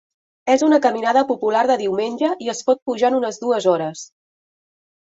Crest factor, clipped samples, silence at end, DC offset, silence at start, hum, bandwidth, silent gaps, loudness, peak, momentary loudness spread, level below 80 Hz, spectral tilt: 16 dB; under 0.1%; 1 s; under 0.1%; 0.45 s; none; 8 kHz; 2.82-2.86 s; -19 LUFS; -2 dBFS; 7 LU; -68 dBFS; -4 dB/octave